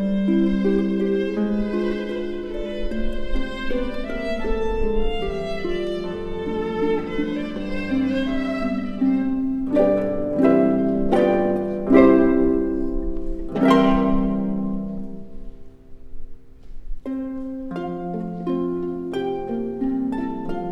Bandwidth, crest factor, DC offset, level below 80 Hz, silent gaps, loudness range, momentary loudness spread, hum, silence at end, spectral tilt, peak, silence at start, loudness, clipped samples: 7.8 kHz; 20 dB; under 0.1%; -32 dBFS; none; 11 LU; 12 LU; none; 0 s; -8 dB/octave; 0 dBFS; 0 s; -22 LUFS; under 0.1%